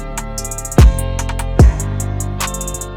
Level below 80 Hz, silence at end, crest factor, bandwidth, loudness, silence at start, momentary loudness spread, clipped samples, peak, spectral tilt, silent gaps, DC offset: -16 dBFS; 0 s; 12 dB; 18 kHz; -16 LUFS; 0 s; 12 LU; under 0.1%; -2 dBFS; -5.5 dB/octave; none; under 0.1%